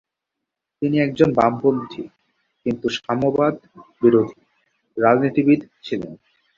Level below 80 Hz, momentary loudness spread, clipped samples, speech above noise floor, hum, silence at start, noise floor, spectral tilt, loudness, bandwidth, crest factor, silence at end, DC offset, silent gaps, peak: -56 dBFS; 17 LU; under 0.1%; 63 dB; none; 0.8 s; -82 dBFS; -7.5 dB/octave; -20 LUFS; 7.4 kHz; 18 dB; 0.45 s; under 0.1%; none; -2 dBFS